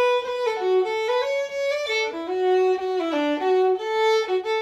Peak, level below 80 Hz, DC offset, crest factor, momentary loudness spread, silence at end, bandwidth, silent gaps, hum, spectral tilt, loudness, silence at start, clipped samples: -12 dBFS; -68 dBFS; under 0.1%; 10 dB; 5 LU; 0 s; 12 kHz; none; none; -2.5 dB/octave; -23 LUFS; 0 s; under 0.1%